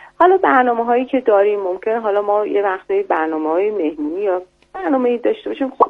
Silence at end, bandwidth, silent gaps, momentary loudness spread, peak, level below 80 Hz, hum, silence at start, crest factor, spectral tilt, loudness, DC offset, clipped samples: 0 s; 4.4 kHz; none; 8 LU; 0 dBFS; -60 dBFS; none; 0 s; 16 dB; -6.5 dB/octave; -17 LUFS; under 0.1%; under 0.1%